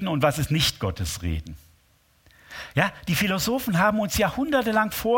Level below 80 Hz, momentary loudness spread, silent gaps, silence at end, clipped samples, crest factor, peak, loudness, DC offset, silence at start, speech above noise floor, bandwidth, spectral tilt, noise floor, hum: -42 dBFS; 9 LU; none; 0 s; under 0.1%; 20 dB; -4 dBFS; -24 LUFS; under 0.1%; 0 s; 38 dB; 17 kHz; -4.5 dB/octave; -62 dBFS; none